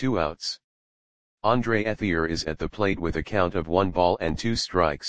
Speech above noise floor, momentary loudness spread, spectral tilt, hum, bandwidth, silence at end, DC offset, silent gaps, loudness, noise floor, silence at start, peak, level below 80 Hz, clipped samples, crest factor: over 65 dB; 6 LU; -5.5 dB/octave; none; 9.8 kHz; 0 s; 0.9%; 0.64-1.38 s; -25 LUFS; under -90 dBFS; 0 s; -4 dBFS; -44 dBFS; under 0.1%; 20 dB